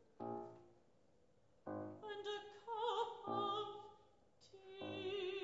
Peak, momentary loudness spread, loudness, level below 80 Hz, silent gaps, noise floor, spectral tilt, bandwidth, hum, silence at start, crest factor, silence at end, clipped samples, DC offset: -28 dBFS; 17 LU; -46 LUFS; -86 dBFS; none; -75 dBFS; -2.5 dB/octave; 7.6 kHz; none; 0 s; 20 dB; 0 s; under 0.1%; under 0.1%